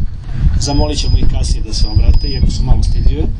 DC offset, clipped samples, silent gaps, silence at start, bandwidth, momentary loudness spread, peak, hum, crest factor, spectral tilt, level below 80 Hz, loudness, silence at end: under 0.1%; 0.3%; none; 0 s; 10 kHz; 4 LU; 0 dBFS; none; 10 dB; -5.5 dB/octave; -12 dBFS; -16 LUFS; 0 s